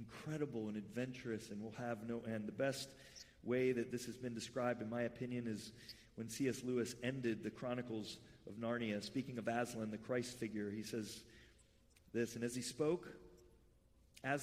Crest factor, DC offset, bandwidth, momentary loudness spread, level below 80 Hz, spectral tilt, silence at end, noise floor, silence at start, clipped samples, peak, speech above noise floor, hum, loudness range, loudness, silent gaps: 18 dB; under 0.1%; 15.5 kHz; 11 LU; -74 dBFS; -5 dB/octave; 0 s; -70 dBFS; 0 s; under 0.1%; -26 dBFS; 27 dB; none; 3 LU; -44 LUFS; none